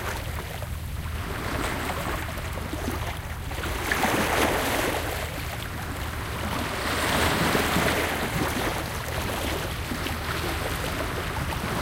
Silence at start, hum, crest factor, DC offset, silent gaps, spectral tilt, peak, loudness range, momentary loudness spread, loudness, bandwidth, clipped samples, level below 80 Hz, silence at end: 0 s; none; 18 dB; under 0.1%; none; -4 dB/octave; -10 dBFS; 5 LU; 10 LU; -27 LUFS; 17 kHz; under 0.1%; -36 dBFS; 0 s